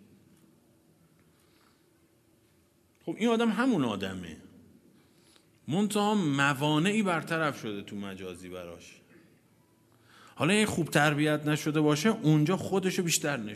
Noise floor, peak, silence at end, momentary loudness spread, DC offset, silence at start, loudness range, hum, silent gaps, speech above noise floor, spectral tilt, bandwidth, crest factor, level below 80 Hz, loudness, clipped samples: -66 dBFS; -8 dBFS; 0 s; 17 LU; under 0.1%; 3.05 s; 8 LU; none; none; 38 dB; -5 dB/octave; 14 kHz; 22 dB; -70 dBFS; -28 LUFS; under 0.1%